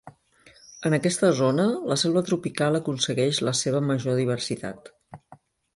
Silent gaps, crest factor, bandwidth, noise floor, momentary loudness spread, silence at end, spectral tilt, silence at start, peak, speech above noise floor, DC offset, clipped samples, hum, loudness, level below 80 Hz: none; 18 dB; 11.5 kHz; -56 dBFS; 9 LU; 0.4 s; -5 dB/octave; 0.05 s; -8 dBFS; 32 dB; under 0.1%; under 0.1%; none; -24 LUFS; -64 dBFS